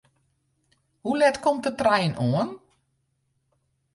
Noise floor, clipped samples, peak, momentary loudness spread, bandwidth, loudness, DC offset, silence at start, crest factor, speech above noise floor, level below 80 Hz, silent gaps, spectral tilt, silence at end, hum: -73 dBFS; under 0.1%; -8 dBFS; 9 LU; 11.5 kHz; -24 LUFS; under 0.1%; 1.05 s; 20 dB; 50 dB; -62 dBFS; none; -6 dB/octave; 1.35 s; none